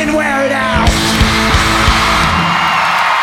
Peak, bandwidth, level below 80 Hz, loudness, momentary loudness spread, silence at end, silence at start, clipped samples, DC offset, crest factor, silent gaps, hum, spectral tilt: 0 dBFS; 16.5 kHz; -20 dBFS; -11 LUFS; 3 LU; 0 s; 0 s; under 0.1%; under 0.1%; 12 dB; none; none; -4 dB/octave